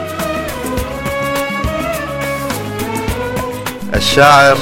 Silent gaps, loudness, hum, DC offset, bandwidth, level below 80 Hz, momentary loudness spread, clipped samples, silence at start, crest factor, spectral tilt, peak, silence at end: none; -15 LUFS; none; under 0.1%; 17 kHz; -30 dBFS; 13 LU; 0.3%; 0 s; 14 dB; -4 dB/octave; 0 dBFS; 0 s